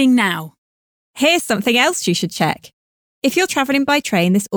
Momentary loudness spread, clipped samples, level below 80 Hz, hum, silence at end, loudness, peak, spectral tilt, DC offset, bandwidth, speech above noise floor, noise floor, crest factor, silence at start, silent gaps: 7 LU; under 0.1%; -60 dBFS; none; 0 s; -16 LUFS; -4 dBFS; -4 dB/octave; under 0.1%; over 20 kHz; over 74 dB; under -90 dBFS; 14 dB; 0 s; 0.58-1.14 s, 2.73-3.22 s